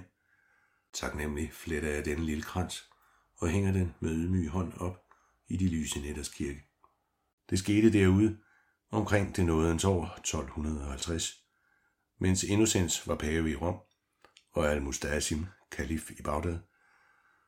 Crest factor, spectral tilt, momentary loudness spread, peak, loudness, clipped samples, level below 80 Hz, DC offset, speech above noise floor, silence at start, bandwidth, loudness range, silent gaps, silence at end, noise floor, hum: 20 dB; -5 dB/octave; 12 LU; -12 dBFS; -31 LUFS; under 0.1%; -46 dBFS; under 0.1%; 43 dB; 0 s; 16 kHz; 6 LU; 7.33-7.38 s; 0.85 s; -74 dBFS; none